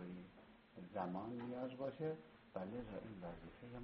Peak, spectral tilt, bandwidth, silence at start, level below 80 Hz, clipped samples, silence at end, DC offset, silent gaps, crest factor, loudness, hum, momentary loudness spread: -30 dBFS; -6.5 dB/octave; 5.6 kHz; 0 s; -70 dBFS; under 0.1%; 0 s; under 0.1%; none; 20 dB; -49 LUFS; none; 13 LU